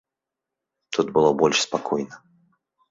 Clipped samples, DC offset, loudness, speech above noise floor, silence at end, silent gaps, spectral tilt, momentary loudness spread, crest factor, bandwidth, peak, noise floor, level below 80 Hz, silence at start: under 0.1%; under 0.1%; -22 LUFS; 65 dB; 0.75 s; none; -3.5 dB/octave; 10 LU; 20 dB; 7.8 kHz; -4 dBFS; -86 dBFS; -64 dBFS; 0.9 s